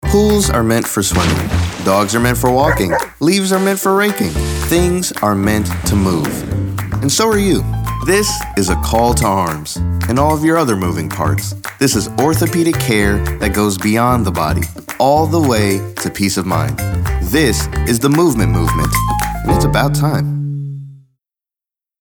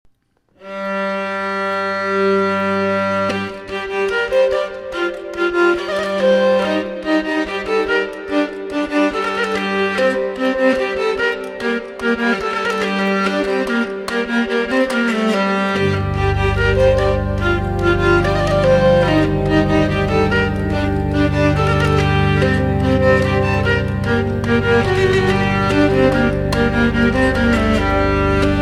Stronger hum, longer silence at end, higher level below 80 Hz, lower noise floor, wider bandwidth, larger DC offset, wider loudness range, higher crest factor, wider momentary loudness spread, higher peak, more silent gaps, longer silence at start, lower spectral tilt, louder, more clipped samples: neither; first, 1.05 s vs 0 s; about the same, -26 dBFS vs -30 dBFS; first, -87 dBFS vs -59 dBFS; first, over 20 kHz vs 12.5 kHz; neither; about the same, 2 LU vs 4 LU; about the same, 14 dB vs 16 dB; about the same, 6 LU vs 7 LU; about the same, 0 dBFS vs 0 dBFS; neither; second, 0 s vs 0.6 s; second, -5 dB/octave vs -6.5 dB/octave; about the same, -15 LUFS vs -17 LUFS; neither